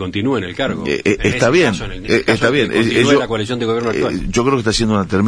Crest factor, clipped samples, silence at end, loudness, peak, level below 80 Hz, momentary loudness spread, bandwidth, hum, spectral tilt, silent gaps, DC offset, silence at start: 16 dB; under 0.1%; 0 s; -16 LUFS; 0 dBFS; -34 dBFS; 6 LU; 10.5 kHz; none; -5 dB/octave; none; under 0.1%; 0 s